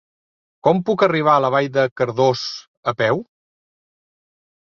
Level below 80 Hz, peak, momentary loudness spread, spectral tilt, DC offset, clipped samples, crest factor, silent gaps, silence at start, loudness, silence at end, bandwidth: -62 dBFS; 0 dBFS; 10 LU; -6 dB/octave; under 0.1%; under 0.1%; 20 dB; 1.91-1.96 s, 2.68-2.83 s; 0.65 s; -19 LUFS; 1.45 s; 7.2 kHz